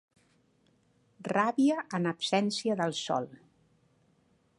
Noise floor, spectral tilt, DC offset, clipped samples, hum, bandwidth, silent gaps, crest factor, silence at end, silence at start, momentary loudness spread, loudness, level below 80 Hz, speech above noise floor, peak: -69 dBFS; -5 dB/octave; under 0.1%; under 0.1%; none; 11 kHz; none; 20 dB; 1.25 s; 1.2 s; 7 LU; -30 LUFS; -78 dBFS; 39 dB; -12 dBFS